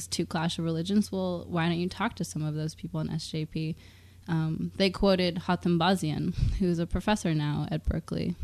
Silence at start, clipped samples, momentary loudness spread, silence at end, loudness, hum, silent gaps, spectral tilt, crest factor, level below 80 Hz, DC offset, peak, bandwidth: 0 s; under 0.1%; 8 LU; 0 s; -29 LUFS; none; none; -6 dB/octave; 18 dB; -42 dBFS; under 0.1%; -10 dBFS; 13.5 kHz